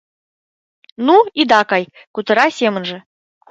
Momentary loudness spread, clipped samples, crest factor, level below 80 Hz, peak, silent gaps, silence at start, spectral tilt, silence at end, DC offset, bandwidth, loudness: 15 LU; under 0.1%; 16 dB; -66 dBFS; 0 dBFS; 2.07-2.14 s; 1 s; -4.5 dB/octave; 0.5 s; under 0.1%; 8 kHz; -14 LUFS